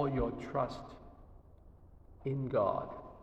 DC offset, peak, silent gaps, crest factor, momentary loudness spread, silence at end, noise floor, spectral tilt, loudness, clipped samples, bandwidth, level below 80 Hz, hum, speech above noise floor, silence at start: under 0.1%; -20 dBFS; none; 18 dB; 20 LU; 0 s; -58 dBFS; -8.5 dB/octave; -36 LUFS; under 0.1%; 8.2 kHz; -52 dBFS; none; 22 dB; 0 s